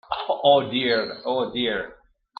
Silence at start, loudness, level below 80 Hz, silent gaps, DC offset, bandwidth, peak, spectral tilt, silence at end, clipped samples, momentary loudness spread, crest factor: 0.1 s; -23 LUFS; -60 dBFS; none; under 0.1%; 5.2 kHz; -4 dBFS; -7.5 dB/octave; 0.45 s; under 0.1%; 9 LU; 20 dB